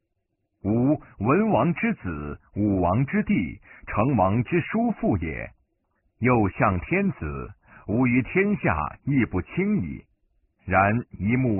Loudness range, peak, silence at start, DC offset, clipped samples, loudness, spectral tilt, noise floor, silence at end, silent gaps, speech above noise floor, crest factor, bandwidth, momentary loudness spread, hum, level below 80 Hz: 1 LU; -6 dBFS; 0.65 s; under 0.1%; under 0.1%; -24 LUFS; -4.5 dB/octave; -76 dBFS; 0 s; none; 53 dB; 18 dB; 3.1 kHz; 13 LU; none; -44 dBFS